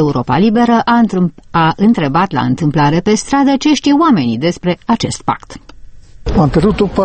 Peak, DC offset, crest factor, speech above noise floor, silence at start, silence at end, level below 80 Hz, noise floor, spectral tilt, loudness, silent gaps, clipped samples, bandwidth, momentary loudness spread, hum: 0 dBFS; under 0.1%; 12 dB; 21 dB; 0 s; 0 s; -32 dBFS; -33 dBFS; -6 dB/octave; -12 LUFS; none; under 0.1%; 8.8 kHz; 7 LU; none